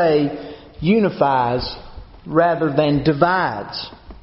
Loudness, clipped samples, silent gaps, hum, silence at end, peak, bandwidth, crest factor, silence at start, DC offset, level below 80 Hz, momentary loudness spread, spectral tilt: -18 LUFS; under 0.1%; none; none; 0.1 s; -2 dBFS; 6 kHz; 18 dB; 0 s; under 0.1%; -42 dBFS; 17 LU; -5 dB/octave